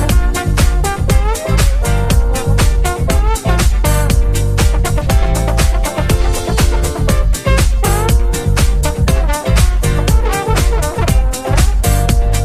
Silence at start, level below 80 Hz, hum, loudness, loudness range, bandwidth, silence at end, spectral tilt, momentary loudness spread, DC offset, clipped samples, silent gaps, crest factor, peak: 0 s; -14 dBFS; none; -14 LUFS; 0 LU; 15.5 kHz; 0 s; -5 dB/octave; 2 LU; under 0.1%; under 0.1%; none; 12 dB; 0 dBFS